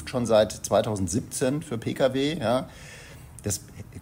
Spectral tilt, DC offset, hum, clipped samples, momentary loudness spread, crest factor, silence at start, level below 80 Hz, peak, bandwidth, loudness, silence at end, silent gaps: -5 dB/octave; under 0.1%; none; under 0.1%; 21 LU; 18 dB; 0 s; -50 dBFS; -8 dBFS; 16 kHz; -26 LUFS; 0 s; none